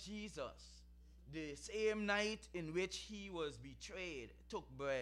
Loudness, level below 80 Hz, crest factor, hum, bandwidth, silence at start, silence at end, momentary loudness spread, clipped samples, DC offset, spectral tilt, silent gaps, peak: -44 LUFS; -62 dBFS; 20 dB; none; 12.5 kHz; 0 s; 0 s; 15 LU; under 0.1%; under 0.1%; -4 dB/octave; none; -26 dBFS